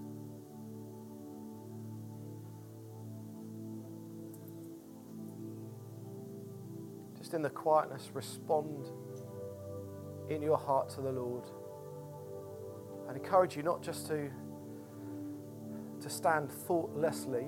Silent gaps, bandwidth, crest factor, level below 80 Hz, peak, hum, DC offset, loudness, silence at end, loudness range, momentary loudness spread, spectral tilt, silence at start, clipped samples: none; 17 kHz; 22 dB; -80 dBFS; -16 dBFS; none; under 0.1%; -39 LUFS; 0 s; 11 LU; 17 LU; -6 dB/octave; 0 s; under 0.1%